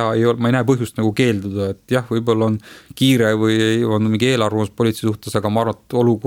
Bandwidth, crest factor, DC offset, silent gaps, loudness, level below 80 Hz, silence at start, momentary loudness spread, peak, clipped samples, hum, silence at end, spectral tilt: 17 kHz; 14 dB; under 0.1%; none; -18 LUFS; -54 dBFS; 0 s; 6 LU; -2 dBFS; under 0.1%; none; 0 s; -6 dB/octave